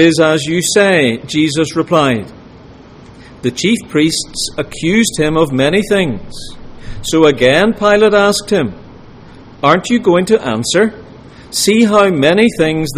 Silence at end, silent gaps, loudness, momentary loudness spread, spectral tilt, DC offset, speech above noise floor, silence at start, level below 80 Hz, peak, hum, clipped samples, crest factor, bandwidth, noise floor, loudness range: 0 s; none; -12 LUFS; 11 LU; -4.5 dB/octave; under 0.1%; 25 dB; 0 s; -38 dBFS; 0 dBFS; none; under 0.1%; 12 dB; 15.5 kHz; -37 dBFS; 4 LU